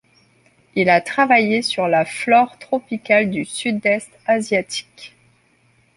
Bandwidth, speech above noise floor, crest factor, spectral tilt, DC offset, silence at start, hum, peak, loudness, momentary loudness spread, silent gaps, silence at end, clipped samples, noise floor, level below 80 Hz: 11.5 kHz; 40 dB; 18 dB; -4.5 dB/octave; under 0.1%; 0.75 s; none; -2 dBFS; -18 LUFS; 9 LU; none; 0.9 s; under 0.1%; -58 dBFS; -62 dBFS